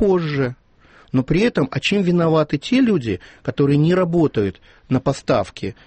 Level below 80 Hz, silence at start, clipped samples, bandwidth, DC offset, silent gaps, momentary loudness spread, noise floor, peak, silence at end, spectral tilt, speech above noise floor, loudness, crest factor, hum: -44 dBFS; 0 s; under 0.1%; 8.8 kHz; under 0.1%; none; 9 LU; -50 dBFS; -6 dBFS; 0.15 s; -7 dB/octave; 32 dB; -19 LUFS; 14 dB; none